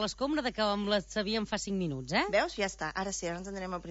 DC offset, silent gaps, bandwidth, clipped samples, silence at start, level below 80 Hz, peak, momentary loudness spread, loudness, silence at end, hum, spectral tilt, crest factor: under 0.1%; none; 8 kHz; under 0.1%; 0 s; -54 dBFS; -16 dBFS; 8 LU; -32 LUFS; 0 s; none; -4 dB/octave; 18 dB